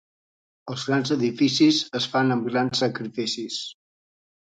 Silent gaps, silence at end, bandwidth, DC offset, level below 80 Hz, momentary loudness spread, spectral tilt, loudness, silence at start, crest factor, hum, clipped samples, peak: none; 0.7 s; 9.4 kHz; under 0.1%; -68 dBFS; 13 LU; -4.5 dB/octave; -23 LUFS; 0.65 s; 18 dB; none; under 0.1%; -8 dBFS